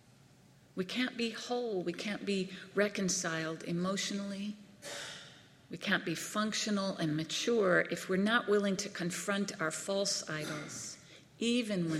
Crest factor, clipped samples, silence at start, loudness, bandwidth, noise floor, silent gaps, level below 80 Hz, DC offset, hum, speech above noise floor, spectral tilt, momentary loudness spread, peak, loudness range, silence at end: 20 dB; under 0.1%; 0.75 s; -34 LUFS; 15.5 kHz; -62 dBFS; none; -76 dBFS; under 0.1%; none; 28 dB; -4 dB/octave; 13 LU; -16 dBFS; 5 LU; 0 s